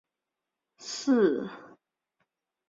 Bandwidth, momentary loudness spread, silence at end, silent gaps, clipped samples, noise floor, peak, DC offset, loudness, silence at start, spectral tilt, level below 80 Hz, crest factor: 7.8 kHz; 20 LU; 1.05 s; none; under 0.1%; -87 dBFS; -14 dBFS; under 0.1%; -27 LUFS; 0.8 s; -4.5 dB/octave; -78 dBFS; 18 dB